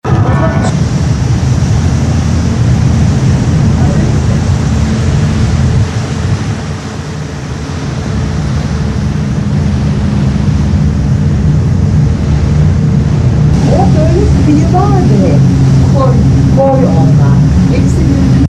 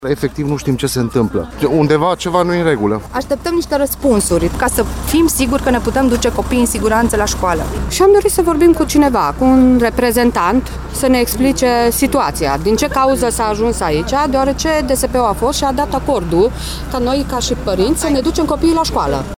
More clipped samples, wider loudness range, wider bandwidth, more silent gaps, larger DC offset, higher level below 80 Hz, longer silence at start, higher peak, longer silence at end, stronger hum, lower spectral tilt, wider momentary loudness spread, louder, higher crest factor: neither; first, 7 LU vs 3 LU; second, 10 kHz vs 17.5 kHz; neither; neither; first, -20 dBFS vs -26 dBFS; about the same, 0.05 s vs 0 s; about the same, 0 dBFS vs 0 dBFS; about the same, 0 s vs 0.05 s; neither; first, -7.5 dB/octave vs -5 dB/octave; about the same, 7 LU vs 6 LU; first, -10 LUFS vs -14 LUFS; second, 8 dB vs 14 dB